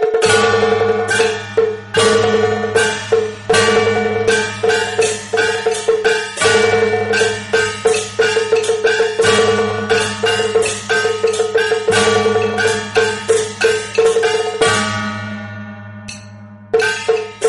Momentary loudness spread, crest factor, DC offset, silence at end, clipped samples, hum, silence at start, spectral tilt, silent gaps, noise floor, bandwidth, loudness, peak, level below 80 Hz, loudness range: 5 LU; 14 dB; under 0.1%; 0 s; under 0.1%; none; 0 s; -3 dB/octave; none; -36 dBFS; 11.5 kHz; -15 LUFS; -2 dBFS; -48 dBFS; 2 LU